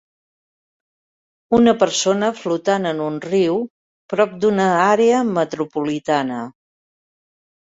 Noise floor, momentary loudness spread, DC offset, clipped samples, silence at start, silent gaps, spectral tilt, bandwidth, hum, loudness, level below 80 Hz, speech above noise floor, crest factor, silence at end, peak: under -90 dBFS; 10 LU; under 0.1%; under 0.1%; 1.5 s; 3.70-4.09 s; -4.5 dB/octave; 8 kHz; none; -18 LUFS; -58 dBFS; over 73 dB; 18 dB; 1.15 s; -2 dBFS